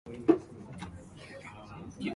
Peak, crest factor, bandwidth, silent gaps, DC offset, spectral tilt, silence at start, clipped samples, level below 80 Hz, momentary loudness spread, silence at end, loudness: -10 dBFS; 24 dB; 11.5 kHz; none; under 0.1%; -7 dB/octave; 0.05 s; under 0.1%; -58 dBFS; 19 LU; 0 s; -32 LUFS